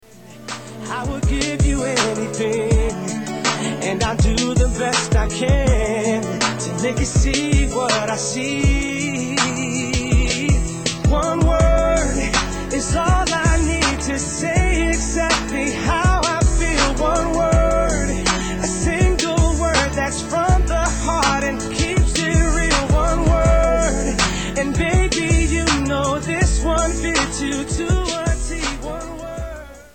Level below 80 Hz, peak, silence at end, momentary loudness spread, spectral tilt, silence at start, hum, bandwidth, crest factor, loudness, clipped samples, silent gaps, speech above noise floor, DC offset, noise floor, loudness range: -22 dBFS; -4 dBFS; 0.1 s; 6 LU; -4.5 dB/octave; 0.15 s; none; 9.2 kHz; 14 dB; -19 LUFS; under 0.1%; none; 19 dB; 0.3%; -38 dBFS; 2 LU